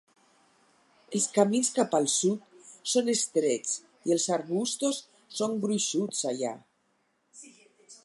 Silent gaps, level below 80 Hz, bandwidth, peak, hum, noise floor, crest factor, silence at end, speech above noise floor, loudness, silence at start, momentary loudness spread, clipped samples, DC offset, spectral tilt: none; -82 dBFS; 11.5 kHz; -10 dBFS; none; -72 dBFS; 20 dB; 0.1 s; 45 dB; -28 LUFS; 1.1 s; 10 LU; under 0.1%; under 0.1%; -3.5 dB/octave